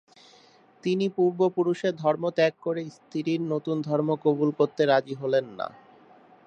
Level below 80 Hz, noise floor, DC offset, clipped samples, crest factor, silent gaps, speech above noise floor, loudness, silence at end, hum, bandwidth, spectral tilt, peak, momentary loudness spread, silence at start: -78 dBFS; -56 dBFS; under 0.1%; under 0.1%; 18 dB; none; 31 dB; -26 LUFS; 0.8 s; none; 8.6 kHz; -7 dB/octave; -8 dBFS; 10 LU; 0.85 s